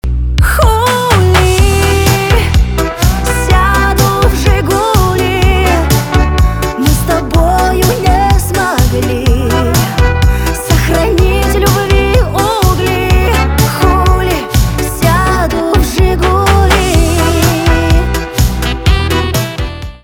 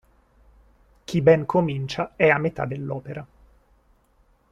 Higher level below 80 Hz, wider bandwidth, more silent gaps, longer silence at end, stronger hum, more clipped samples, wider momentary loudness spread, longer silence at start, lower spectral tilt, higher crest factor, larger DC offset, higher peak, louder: first, -14 dBFS vs -54 dBFS; first, 19.5 kHz vs 9.8 kHz; neither; second, 0.05 s vs 1.25 s; neither; neither; second, 4 LU vs 17 LU; second, 0.05 s vs 1.1 s; second, -5 dB/octave vs -7 dB/octave; second, 10 dB vs 20 dB; neither; first, 0 dBFS vs -4 dBFS; first, -10 LUFS vs -22 LUFS